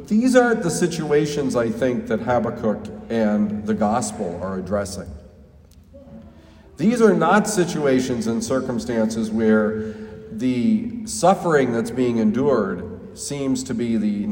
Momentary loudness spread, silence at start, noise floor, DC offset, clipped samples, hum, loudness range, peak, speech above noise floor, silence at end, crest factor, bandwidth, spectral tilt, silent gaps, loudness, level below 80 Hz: 11 LU; 0 s; -48 dBFS; under 0.1%; under 0.1%; none; 5 LU; -2 dBFS; 28 dB; 0 s; 20 dB; 16.5 kHz; -5.5 dB/octave; none; -21 LUFS; -50 dBFS